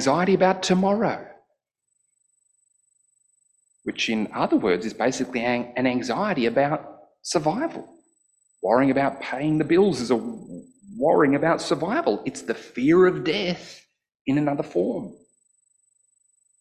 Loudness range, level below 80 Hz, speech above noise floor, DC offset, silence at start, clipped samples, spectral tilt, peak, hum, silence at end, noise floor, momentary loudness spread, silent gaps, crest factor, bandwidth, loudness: 7 LU; -62 dBFS; 53 dB; under 0.1%; 0 s; under 0.1%; -5.5 dB/octave; -6 dBFS; none; 1.45 s; -75 dBFS; 14 LU; 14.15-14.25 s; 18 dB; 11.5 kHz; -23 LUFS